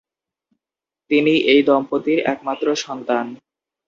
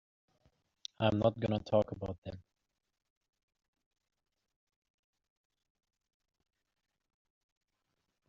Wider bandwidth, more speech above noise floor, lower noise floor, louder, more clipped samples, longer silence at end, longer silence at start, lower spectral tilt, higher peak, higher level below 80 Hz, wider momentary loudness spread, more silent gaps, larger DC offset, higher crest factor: about the same, 7.6 kHz vs 7.2 kHz; first, 71 dB vs 51 dB; first, -89 dBFS vs -85 dBFS; first, -18 LUFS vs -34 LUFS; neither; second, 0.5 s vs 5.9 s; about the same, 1.1 s vs 1 s; second, -4.5 dB/octave vs -6 dB/octave; first, -2 dBFS vs -14 dBFS; about the same, -64 dBFS vs -66 dBFS; second, 9 LU vs 20 LU; second, none vs 2.18-2.22 s; neither; second, 18 dB vs 26 dB